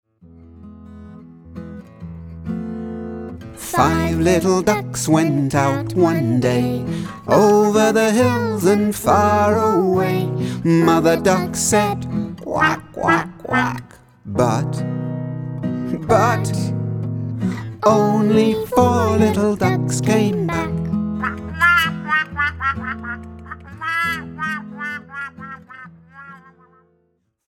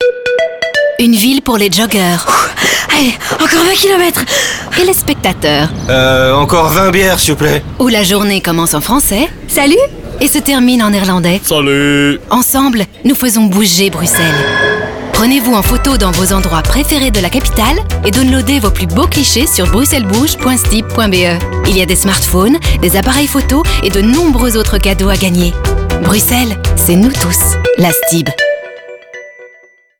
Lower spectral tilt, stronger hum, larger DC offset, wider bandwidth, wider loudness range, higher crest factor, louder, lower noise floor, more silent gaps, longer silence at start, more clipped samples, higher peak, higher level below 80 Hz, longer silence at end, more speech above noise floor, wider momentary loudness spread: first, -5.5 dB/octave vs -4 dB/octave; neither; neither; about the same, 18.5 kHz vs 19.5 kHz; first, 10 LU vs 1 LU; first, 16 dB vs 10 dB; second, -18 LUFS vs -10 LUFS; first, -66 dBFS vs -43 dBFS; neither; first, 0.25 s vs 0 s; neither; about the same, -2 dBFS vs 0 dBFS; second, -44 dBFS vs -20 dBFS; first, 1.1 s vs 0.55 s; first, 50 dB vs 34 dB; first, 17 LU vs 4 LU